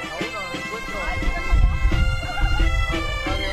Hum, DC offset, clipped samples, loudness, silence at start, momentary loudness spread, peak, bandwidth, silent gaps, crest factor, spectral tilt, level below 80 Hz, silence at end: none; under 0.1%; under 0.1%; -24 LUFS; 0 s; 6 LU; -6 dBFS; 12.5 kHz; none; 14 dB; -5 dB/octave; -22 dBFS; 0 s